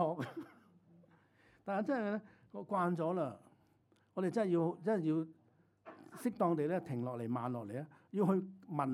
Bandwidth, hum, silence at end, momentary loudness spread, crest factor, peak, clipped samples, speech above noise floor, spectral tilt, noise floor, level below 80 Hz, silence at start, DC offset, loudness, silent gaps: 13.5 kHz; none; 0 s; 17 LU; 18 dB; -20 dBFS; under 0.1%; 36 dB; -8.5 dB/octave; -72 dBFS; -86 dBFS; 0 s; under 0.1%; -38 LUFS; none